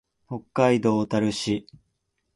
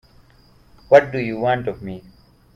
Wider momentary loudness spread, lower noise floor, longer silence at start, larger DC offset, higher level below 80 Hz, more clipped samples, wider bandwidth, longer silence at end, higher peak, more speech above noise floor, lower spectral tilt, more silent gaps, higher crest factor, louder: second, 14 LU vs 19 LU; first, -75 dBFS vs -52 dBFS; second, 0.3 s vs 0.9 s; neither; second, -58 dBFS vs -52 dBFS; neither; first, 11.5 kHz vs 7.2 kHz; first, 0.75 s vs 0.55 s; second, -6 dBFS vs 0 dBFS; first, 52 dB vs 34 dB; about the same, -6 dB/octave vs -7 dB/octave; neither; about the same, 18 dB vs 22 dB; second, -24 LUFS vs -18 LUFS